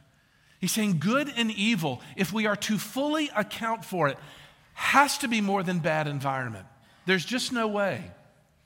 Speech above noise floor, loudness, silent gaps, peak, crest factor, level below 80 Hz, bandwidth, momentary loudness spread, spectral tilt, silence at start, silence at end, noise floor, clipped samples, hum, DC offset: 35 dB; -27 LUFS; none; -6 dBFS; 22 dB; -68 dBFS; 17 kHz; 9 LU; -4 dB/octave; 0.6 s; 0.5 s; -62 dBFS; under 0.1%; none; under 0.1%